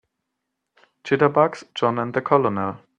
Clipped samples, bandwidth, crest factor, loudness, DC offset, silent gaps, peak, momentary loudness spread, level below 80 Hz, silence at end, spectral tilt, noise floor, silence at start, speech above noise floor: under 0.1%; 9 kHz; 22 dB; -21 LUFS; under 0.1%; none; -2 dBFS; 7 LU; -64 dBFS; 0.2 s; -7 dB/octave; -80 dBFS; 1.05 s; 59 dB